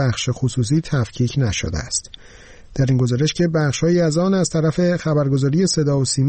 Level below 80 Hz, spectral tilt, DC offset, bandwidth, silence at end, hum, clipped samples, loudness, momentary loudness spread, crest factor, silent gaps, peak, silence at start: -40 dBFS; -5.5 dB/octave; under 0.1%; 8.8 kHz; 0 s; none; under 0.1%; -19 LUFS; 5 LU; 10 dB; none; -8 dBFS; 0 s